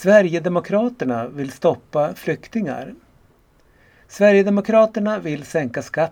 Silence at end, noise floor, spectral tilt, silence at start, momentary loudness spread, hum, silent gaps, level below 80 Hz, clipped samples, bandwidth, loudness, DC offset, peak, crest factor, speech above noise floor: 0 s; -55 dBFS; -6.5 dB/octave; 0 s; 11 LU; none; none; -60 dBFS; under 0.1%; 16.5 kHz; -19 LUFS; under 0.1%; 0 dBFS; 20 dB; 37 dB